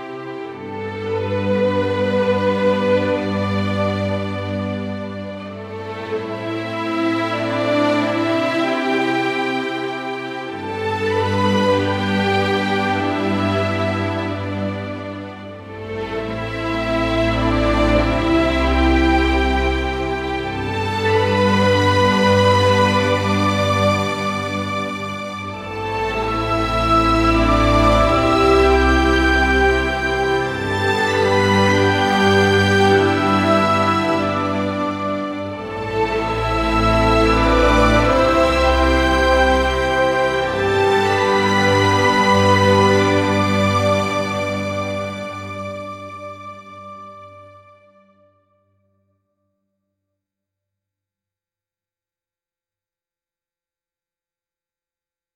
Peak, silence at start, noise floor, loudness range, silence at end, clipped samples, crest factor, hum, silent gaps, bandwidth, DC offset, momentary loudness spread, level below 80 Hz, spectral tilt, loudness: -2 dBFS; 0 s; under -90 dBFS; 8 LU; 7.85 s; under 0.1%; 16 dB; none; none; 15 kHz; under 0.1%; 13 LU; -30 dBFS; -5.5 dB/octave; -17 LUFS